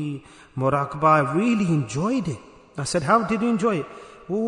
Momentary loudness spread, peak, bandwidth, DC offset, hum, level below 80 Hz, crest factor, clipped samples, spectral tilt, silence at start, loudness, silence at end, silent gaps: 19 LU; -4 dBFS; 11 kHz; under 0.1%; none; -54 dBFS; 18 dB; under 0.1%; -6.5 dB/octave; 0 s; -22 LUFS; 0 s; none